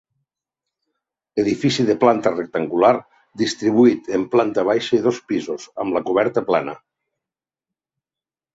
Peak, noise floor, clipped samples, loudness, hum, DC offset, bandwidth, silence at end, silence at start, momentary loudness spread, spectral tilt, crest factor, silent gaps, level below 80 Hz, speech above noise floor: -2 dBFS; under -90 dBFS; under 0.1%; -19 LUFS; none; under 0.1%; 8 kHz; 1.8 s; 1.35 s; 9 LU; -5.5 dB/octave; 18 dB; none; -60 dBFS; over 72 dB